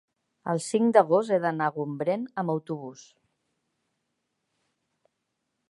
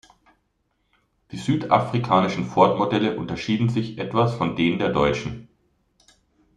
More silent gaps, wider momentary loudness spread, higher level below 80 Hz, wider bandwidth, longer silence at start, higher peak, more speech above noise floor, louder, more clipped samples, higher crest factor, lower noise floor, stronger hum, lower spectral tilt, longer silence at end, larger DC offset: neither; first, 16 LU vs 10 LU; second, -80 dBFS vs -52 dBFS; about the same, 11.5 kHz vs 10.5 kHz; second, 0.45 s vs 1.3 s; about the same, -6 dBFS vs -4 dBFS; first, 55 dB vs 49 dB; second, -26 LUFS vs -22 LUFS; neither; about the same, 24 dB vs 20 dB; first, -80 dBFS vs -71 dBFS; neither; about the same, -6 dB/octave vs -7 dB/octave; first, 2.7 s vs 1.15 s; neither